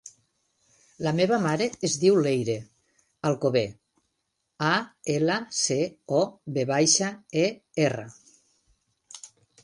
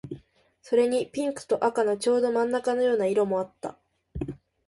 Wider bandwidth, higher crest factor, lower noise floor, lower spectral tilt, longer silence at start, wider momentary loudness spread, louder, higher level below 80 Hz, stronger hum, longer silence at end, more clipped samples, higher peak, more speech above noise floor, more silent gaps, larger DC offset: about the same, 11.5 kHz vs 11.5 kHz; about the same, 20 dB vs 16 dB; first, -78 dBFS vs -58 dBFS; second, -4 dB/octave vs -5.5 dB/octave; about the same, 0.05 s vs 0.05 s; second, 13 LU vs 16 LU; about the same, -25 LUFS vs -26 LUFS; second, -68 dBFS vs -54 dBFS; neither; about the same, 0.4 s vs 0.3 s; neither; about the same, -8 dBFS vs -10 dBFS; first, 53 dB vs 33 dB; neither; neither